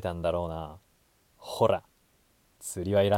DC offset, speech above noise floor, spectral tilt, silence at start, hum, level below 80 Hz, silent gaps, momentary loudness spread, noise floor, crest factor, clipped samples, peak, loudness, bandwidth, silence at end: under 0.1%; 39 dB; -5.5 dB/octave; 0 s; none; -54 dBFS; none; 16 LU; -67 dBFS; 20 dB; under 0.1%; -10 dBFS; -30 LUFS; 17 kHz; 0 s